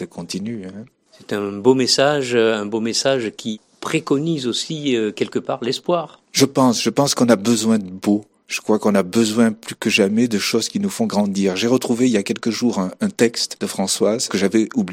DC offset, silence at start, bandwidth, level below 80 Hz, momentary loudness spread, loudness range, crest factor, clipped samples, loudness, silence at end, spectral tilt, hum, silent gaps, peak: under 0.1%; 0 s; 16.5 kHz; -64 dBFS; 10 LU; 3 LU; 18 dB; under 0.1%; -19 LUFS; 0 s; -4 dB/octave; none; none; 0 dBFS